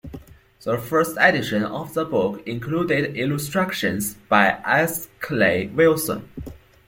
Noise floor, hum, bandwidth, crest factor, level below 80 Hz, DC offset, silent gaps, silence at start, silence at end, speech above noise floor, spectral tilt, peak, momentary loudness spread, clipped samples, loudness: -42 dBFS; none; 17 kHz; 20 dB; -52 dBFS; under 0.1%; none; 0.05 s; 0.3 s; 21 dB; -5 dB/octave; -2 dBFS; 12 LU; under 0.1%; -21 LUFS